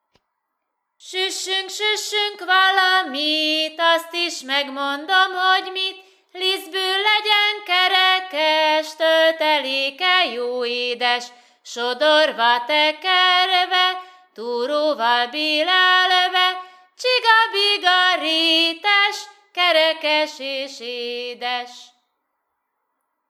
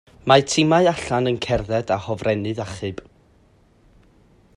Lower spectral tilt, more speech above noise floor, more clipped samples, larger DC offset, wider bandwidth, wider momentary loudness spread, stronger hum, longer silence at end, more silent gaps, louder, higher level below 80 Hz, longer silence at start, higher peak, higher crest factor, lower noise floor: second, 0.5 dB/octave vs -5 dB/octave; first, 57 dB vs 36 dB; neither; neither; first, 16 kHz vs 11.5 kHz; about the same, 12 LU vs 13 LU; neither; about the same, 1.45 s vs 1.55 s; neither; about the same, -18 LUFS vs -20 LUFS; second, -82 dBFS vs -46 dBFS; first, 1.05 s vs 0.25 s; about the same, -2 dBFS vs 0 dBFS; about the same, 18 dB vs 22 dB; first, -77 dBFS vs -56 dBFS